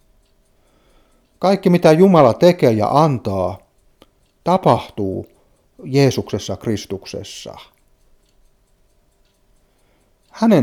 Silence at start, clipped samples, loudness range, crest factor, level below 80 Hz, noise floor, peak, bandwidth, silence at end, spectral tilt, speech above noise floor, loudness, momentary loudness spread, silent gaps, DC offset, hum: 1.4 s; under 0.1%; 15 LU; 18 dB; -54 dBFS; -58 dBFS; 0 dBFS; 15.5 kHz; 0 s; -7 dB/octave; 43 dB; -16 LUFS; 19 LU; none; under 0.1%; none